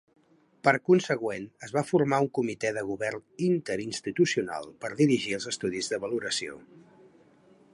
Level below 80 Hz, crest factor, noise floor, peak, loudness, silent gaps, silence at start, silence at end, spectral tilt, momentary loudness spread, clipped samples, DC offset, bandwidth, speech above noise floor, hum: -68 dBFS; 24 dB; -59 dBFS; -6 dBFS; -28 LUFS; none; 0.65 s; 0.95 s; -5 dB/octave; 10 LU; under 0.1%; under 0.1%; 11.5 kHz; 31 dB; none